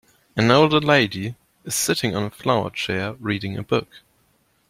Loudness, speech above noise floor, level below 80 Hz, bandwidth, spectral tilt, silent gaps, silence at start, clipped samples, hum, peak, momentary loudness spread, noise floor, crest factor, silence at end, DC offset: -21 LUFS; 43 dB; -56 dBFS; 16.5 kHz; -4.5 dB/octave; none; 0.35 s; under 0.1%; none; -2 dBFS; 12 LU; -63 dBFS; 20 dB; 0.7 s; under 0.1%